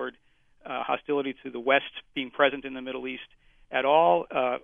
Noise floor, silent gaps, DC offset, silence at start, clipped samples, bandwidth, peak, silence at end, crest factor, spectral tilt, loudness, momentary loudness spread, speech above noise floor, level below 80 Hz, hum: -62 dBFS; none; under 0.1%; 0 s; under 0.1%; 3.8 kHz; -8 dBFS; 0.05 s; 20 dB; -7 dB/octave; -27 LUFS; 15 LU; 35 dB; -66 dBFS; none